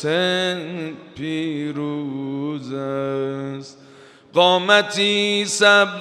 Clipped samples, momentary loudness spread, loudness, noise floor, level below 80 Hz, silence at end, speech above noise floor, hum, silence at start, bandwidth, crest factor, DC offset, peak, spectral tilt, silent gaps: under 0.1%; 16 LU; -19 LUFS; -46 dBFS; -70 dBFS; 0 s; 26 dB; none; 0 s; 14.5 kHz; 20 dB; under 0.1%; 0 dBFS; -3.5 dB/octave; none